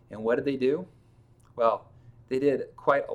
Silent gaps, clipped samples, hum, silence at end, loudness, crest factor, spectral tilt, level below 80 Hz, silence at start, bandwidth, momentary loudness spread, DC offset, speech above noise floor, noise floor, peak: none; under 0.1%; none; 0 s; -28 LUFS; 20 dB; -7.5 dB/octave; -64 dBFS; 0.1 s; 9.4 kHz; 8 LU; under 0.1%; 31 dB; -58 dBFS; -10 dBFS